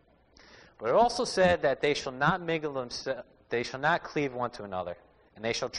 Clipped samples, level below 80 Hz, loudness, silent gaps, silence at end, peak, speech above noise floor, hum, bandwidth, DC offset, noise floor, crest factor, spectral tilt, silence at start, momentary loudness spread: under 0.1%; -58 dBFS; -29 LUFS; none; 0 s; -12 dBFS; 30 dB; none; 10 kHz; under 0.1%; -59 dBFS; 18 dB; -4.5 dB/octave; 0.55 s; 12 LU